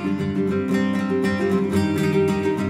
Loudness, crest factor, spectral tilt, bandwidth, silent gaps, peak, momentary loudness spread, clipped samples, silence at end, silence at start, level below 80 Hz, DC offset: -21 LUFS; 12 dB; -7 dB/octave; 15 kHz; none; -8 dBFS; 3 LU; under 0.1%; 0 s; 0 s; -52 dBFS; under 0.1%